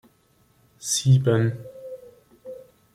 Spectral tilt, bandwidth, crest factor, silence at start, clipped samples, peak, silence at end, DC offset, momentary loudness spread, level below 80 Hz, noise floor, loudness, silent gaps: -5 dB/octave; 15.5 kHz; 18 dB; 0.8 s; under 0.1%; -8 dBFS; 0.35 s; under 0.1%; 24 LU; -58 dBFS; -62 dBFS; -22 LUFS; none